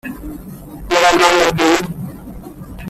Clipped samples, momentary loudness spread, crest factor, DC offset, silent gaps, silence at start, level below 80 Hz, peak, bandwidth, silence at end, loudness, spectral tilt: under 0.1%; 23 LU; 16 dB; under 0.1%; none; 0.05 s; -38 dBFS; 0 dBFS; 15.5 kHz; 0 s; -13 LUFS; -3.5 dB/octave